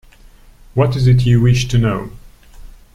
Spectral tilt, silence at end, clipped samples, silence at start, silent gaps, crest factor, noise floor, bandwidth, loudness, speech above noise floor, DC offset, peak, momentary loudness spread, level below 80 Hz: -7 dB/octave; 0.25 s; under 0.1%; 0.75 s; none; 14 dB; -43 dBFS; 11 kHz; -15 LUFS; 30 dB; under 0.1%; -2 dBFS; 12 LU; -32 dBFS